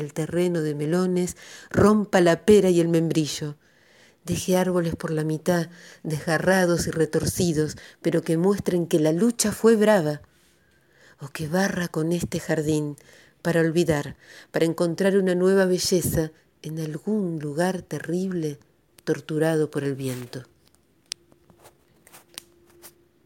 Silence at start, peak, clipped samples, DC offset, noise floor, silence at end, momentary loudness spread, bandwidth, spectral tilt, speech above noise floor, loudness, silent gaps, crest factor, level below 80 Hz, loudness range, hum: 0 s; -4 dBFS; under 0.1%; under 0.1%; -61 dBFS; 0.4 s; 17 LU; 17 kHz; -5.5 dB/octave; 39 dB; -23 LUFS; none; 20 dB; -52 dBFS; 8 LU; none